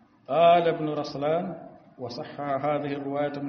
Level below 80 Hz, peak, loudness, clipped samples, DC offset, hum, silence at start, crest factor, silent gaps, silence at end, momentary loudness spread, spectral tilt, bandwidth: -68 dBFS; -8 dBFS; -26 LUFS; under 0.1%; under 0.1%; none; 0.3 s; 18 dB; none; 0 s; 17 LU; -4.5 dB/octave; 6.4 kHz